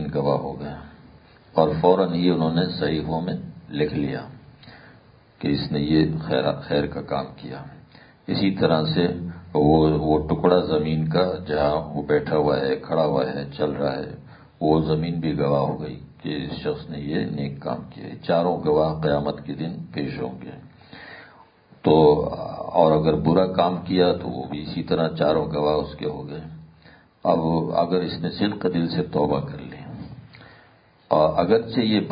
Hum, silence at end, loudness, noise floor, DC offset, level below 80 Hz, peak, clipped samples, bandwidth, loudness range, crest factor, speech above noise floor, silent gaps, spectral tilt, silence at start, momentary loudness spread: none; 0 s; -23 LUFS; -55 dBFS; under 0.1%; -46 dBFS; -2 dBFS; under 0.1%; 5.2 kHz; 5 LU; 20 dB; 33 dB; none; -11.5 dB/octave; 0 s; 16 LU